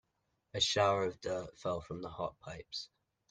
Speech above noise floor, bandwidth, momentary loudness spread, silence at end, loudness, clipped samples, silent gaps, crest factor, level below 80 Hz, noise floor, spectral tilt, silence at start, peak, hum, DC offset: 45 dB; 9.8 kHz; 15 LU; 0.45 s; -36 LUFS; under 0.1%; none; 22 dB; -64 dBFS; -82 dBFS; -3.5 dB/octave; 0.55 s; -16 dBFS; none; under 0.1%